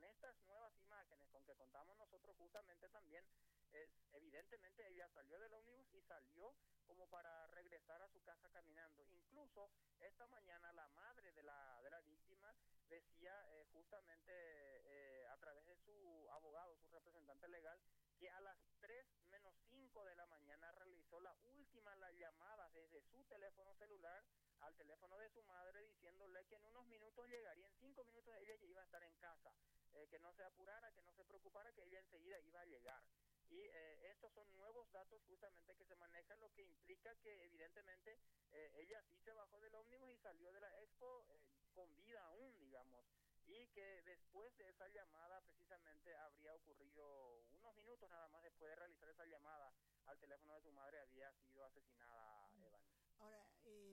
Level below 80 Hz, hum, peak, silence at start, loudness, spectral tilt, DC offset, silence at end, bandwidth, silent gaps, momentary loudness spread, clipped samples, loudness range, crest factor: -86 dBFS; 50 Hz at -90 dBFS; -42 dBFS; 0 s; -66 LUFS; -4 dB/octave; under 0.1%; 0 s; 16 kHz; none; 6 LU; under 0.1%; 2 LU; 24 dB